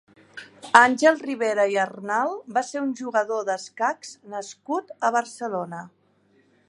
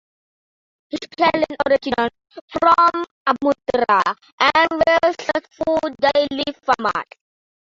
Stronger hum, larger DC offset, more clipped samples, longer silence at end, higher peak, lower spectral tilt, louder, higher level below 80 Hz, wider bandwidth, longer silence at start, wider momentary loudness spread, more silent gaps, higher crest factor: neither; neither; neither; about the same, 0.8 s vs 0.75 s; about the same, 0 dBFS vs -2 dBFS; about the same, -3.5 dB/octave vs -4 dB/octave; second, -23 LUFS vs -18 LUFS; second, -76 dBFS vs -54 dBFS; first, 11.5 kHz vs 7.8 kHz; second, 0.35 s vs 0.95 s; first, 18 LU vs 10 LU; second, none vs 2.41-2.48 s, 3.11-3.25 s, 4.32-4.38 s; first, 24 dB vs 18 dB